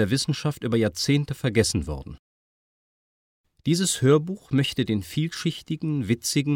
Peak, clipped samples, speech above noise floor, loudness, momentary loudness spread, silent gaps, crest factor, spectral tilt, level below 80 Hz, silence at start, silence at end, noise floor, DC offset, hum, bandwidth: -6 dBFS; under 0.1%; over 66 dB; -24 LUFS; 9 LU; 2.19-3.44 s; 18 dB; -5 dB/octave; -48 dBFS; 0 s; 0 s; under -90 dBFS; under 0.1%; none; 17 kHz